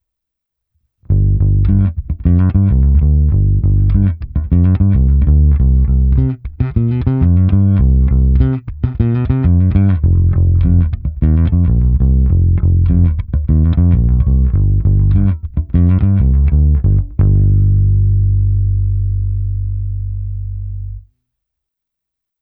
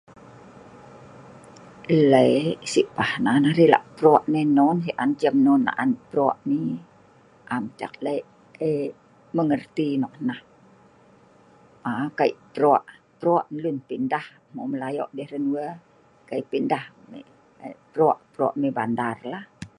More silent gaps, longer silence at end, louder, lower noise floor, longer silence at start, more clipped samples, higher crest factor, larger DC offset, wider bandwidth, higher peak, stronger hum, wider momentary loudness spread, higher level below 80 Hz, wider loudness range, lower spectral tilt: neither; first, 1.4 s vs 0.1 s; first, -13 LUFS vs -23 LUFS; first, -80 dBFS vs -54 dBFS; first, 1.1 s vs 0.85 s; neither; second, 12 dB vs 22 dB; neither; second, 2.7 kHz vs 10.5 kHz; about the same, 0 dBFS vs -2 dBFS; neither; second, 8 LU vs 16 LU; first, -16 dBFS vs -66 dBFS; second, 3 LU vs 10 LU; first, -14 dB/octave vs -6.5 dB/octave